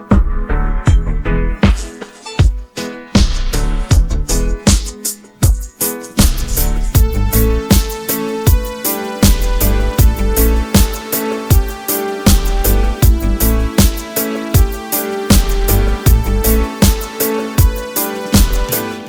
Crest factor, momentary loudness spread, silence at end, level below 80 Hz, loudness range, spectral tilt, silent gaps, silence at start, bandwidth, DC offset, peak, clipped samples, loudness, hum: 12 dB; 5 LU; 0 s; -16 dBFS; 2 LU; -5 dB/octave; none; 0 s; over 20 kHz; under 0.1%; 0 dBFS; under 0.1%; -15 LUFS; none